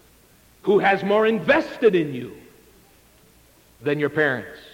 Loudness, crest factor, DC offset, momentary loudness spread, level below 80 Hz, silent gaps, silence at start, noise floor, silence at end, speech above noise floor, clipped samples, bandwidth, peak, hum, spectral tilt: -21 LUFS; 16 dB; under 0.1%; 12 LU; -58 dBFS; none; 0.65 s; -54 dBFS; 0.15 s; 34 dB; under 0.1%; 16.5 kHz; -6 dBFS; none; -6.5 dB/octave